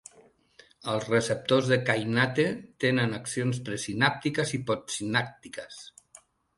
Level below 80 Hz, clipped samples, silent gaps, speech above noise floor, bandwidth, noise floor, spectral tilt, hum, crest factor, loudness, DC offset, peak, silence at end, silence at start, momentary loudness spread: -64 dBFS; under 0.1%; none; 32 dB; 11.5 kHz; -60 dBFS; -4.5 dB/octave; none; 22 dB; -27 LUFS; under 0.1%; -8 dBFS; 0.7 s; 0.85 s; 15 LU